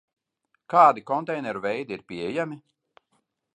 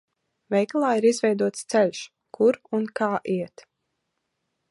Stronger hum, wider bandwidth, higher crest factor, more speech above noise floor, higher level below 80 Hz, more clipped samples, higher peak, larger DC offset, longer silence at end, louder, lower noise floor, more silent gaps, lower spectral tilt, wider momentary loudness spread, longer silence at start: neither; second, 9.6 kHz vs 11.5 kHz; first, 22 dB vs 16 dB; second, 51 dB vs 55 dB; first, -70 dBFS vs -76 dBFS; neither; first, -4 dBFS vs -8 dBFS; neither; second, 0.95 s vs 1.25 s; about the same, -24 LUFS vs -24 LUFS; second, -74 dBFS vs -78 dBFS; neither; first, -6.5 dB/octave vs -5 dB/octave; first, 16 LU vs 9 LU; first, 0.7 s vs 0.5 s